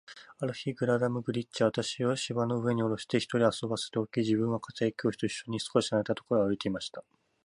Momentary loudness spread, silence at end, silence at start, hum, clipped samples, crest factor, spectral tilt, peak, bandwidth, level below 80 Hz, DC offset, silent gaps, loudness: 7 LU; 0.45 s; 0.1 s; none; under 0.1%; 20 dB; -5.5 dB/octave; -10 dBFS; 11 kHz; -66 dBFS; under 0.1%; none; -31 LUFS